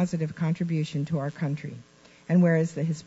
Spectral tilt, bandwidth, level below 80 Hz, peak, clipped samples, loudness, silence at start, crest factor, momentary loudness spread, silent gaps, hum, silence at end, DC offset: -8 dB/octave; 8 kHz; -66 dBFS; -12 dBFS; under 0.1%; -27 LUFS; 0 s; 14 dB; 16 LU; none; none; 0.05 s; under 0.1%